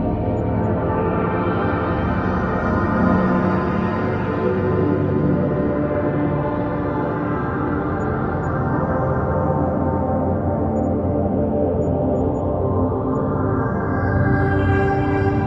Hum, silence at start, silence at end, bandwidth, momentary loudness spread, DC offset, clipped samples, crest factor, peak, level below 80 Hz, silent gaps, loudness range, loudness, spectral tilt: none; 0 s; 0 s; 7.2 kHz; 4 LU; under 0.1%; under 0.1%; 14 dB; -4 dBFS; -34 dBFS; none; 2 LU; -20 LUFS; -10 dB/octave